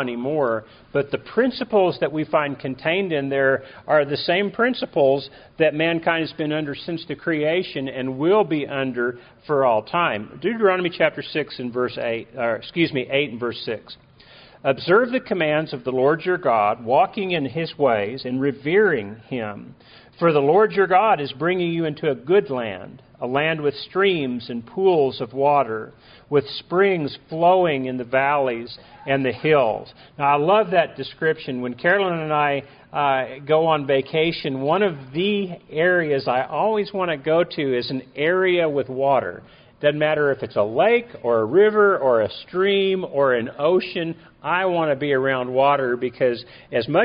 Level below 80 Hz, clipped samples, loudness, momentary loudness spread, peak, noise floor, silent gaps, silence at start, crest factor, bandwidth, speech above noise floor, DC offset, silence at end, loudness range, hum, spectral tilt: -60 dBFS; under 0.1%; -21 LUFS; 9 LU; -4 dBFS; -48 dBFS; none; 0 s; 18 dB; 5.2 kHz; 27 dB; under 0.1%; 0 s; 3 LU; none; -3.5 dB/octave